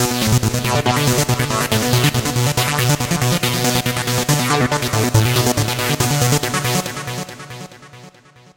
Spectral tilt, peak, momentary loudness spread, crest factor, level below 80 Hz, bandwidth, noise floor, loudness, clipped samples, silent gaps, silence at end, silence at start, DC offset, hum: -4 dB/octave; 0 dBFS; 10 LU; 18 dB; -40 dBFS; 17.5 kHz; -45 dBFS; -17 LUFS; under 0.1%; none; 0.5 s; 0 s; under 0.1%; none